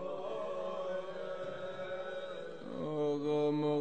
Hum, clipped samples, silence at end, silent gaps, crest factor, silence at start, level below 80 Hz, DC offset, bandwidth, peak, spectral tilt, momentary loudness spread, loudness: none; under 0.1%; 0 s; none; 14 dB; 0 s; -80 dBFS; 0.3%; 8.8 kHz; -24 dBFS; -7 dB/octave; 10 LU; -38 LUFS